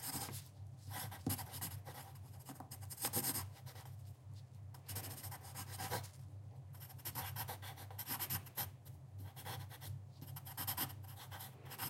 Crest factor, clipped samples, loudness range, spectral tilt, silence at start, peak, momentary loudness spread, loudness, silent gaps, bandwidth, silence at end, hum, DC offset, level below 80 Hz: 24 dB; under 0.1%; 4 LU; -3 dB/octave; 0 s; -24 dBFS; 14 LU; -46 LUFS; none; 16 kHz; 0 s; none; under 0.1%; -72 dBFS